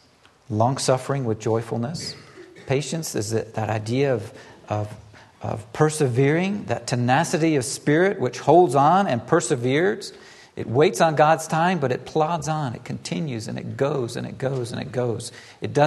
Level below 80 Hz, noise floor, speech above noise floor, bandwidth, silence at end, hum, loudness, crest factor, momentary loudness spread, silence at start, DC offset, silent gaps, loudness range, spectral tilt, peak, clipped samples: -60 dBFS; -54 dBFS; 32 dB; 12.5 kHz; 0 s; none; -22 LUFS; 20 dB; 14 LU; 0.5 s; under 0.1%; none; 7 LU; -5.5 dB/octave; -2 dBFS; under 0.1%